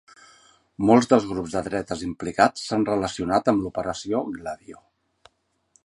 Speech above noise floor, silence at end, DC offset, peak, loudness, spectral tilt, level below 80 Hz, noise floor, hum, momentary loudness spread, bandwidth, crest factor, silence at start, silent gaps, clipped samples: 42 dB; 1.1 s; under 0.1%; -2 dBFS; -23 LUFS; -5.5 dB/octave; -52 dBFS; -65 dBFS; none; 12 LU; 11.5 kHz; 22 dB; 0.8 s; none; under 0.1%